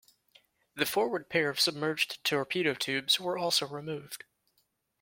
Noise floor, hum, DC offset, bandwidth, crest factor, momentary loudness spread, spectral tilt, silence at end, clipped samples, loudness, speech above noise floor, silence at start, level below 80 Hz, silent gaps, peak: -75 dBFS; none; under 0.1%; 16.5 kHz; 22 dB; 12 LU; -2.5 dB/octave; 0.85 s; under 0.1%; -30 LUFS; 44 dB; 0.75 s; -74 dBFS; none; -10 dBFS